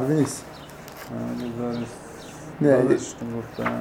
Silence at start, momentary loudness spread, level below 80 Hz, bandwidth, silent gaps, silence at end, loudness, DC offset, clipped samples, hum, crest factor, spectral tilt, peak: 0 s; 20 LU; -54 dBFS; 17.5 kHz; none; 0 s; -25 LUFS; under 0.1%; under 0.1%; none; 20 dB; -6.5 dB/octave; -6 dBFS